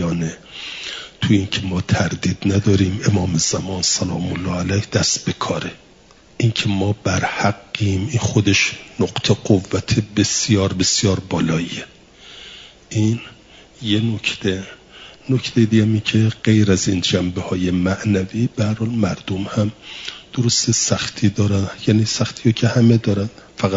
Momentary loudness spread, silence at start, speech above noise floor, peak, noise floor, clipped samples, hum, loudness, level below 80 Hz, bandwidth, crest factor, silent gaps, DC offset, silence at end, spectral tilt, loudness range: 12 LU; 0 s; 30 dB; -2 dBFS; -48 dBFS; under 0.1%; none; -19 LUFS; -50 dBFS; 7.8 kHz; 16 dB; none; under 0.1%; 0 s; -4.5 dB/octave; 4 LU